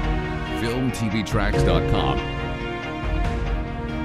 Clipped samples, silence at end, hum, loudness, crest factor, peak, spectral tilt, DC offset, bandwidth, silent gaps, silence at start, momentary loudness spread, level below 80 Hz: under 0.1%; 0 s; none; -24 LUFS; 18 dB; -6 dBFS; -6.5 dB/octave; under 0.1%; 14 kHz; none; 0 s; 8 LU; -28 dBFS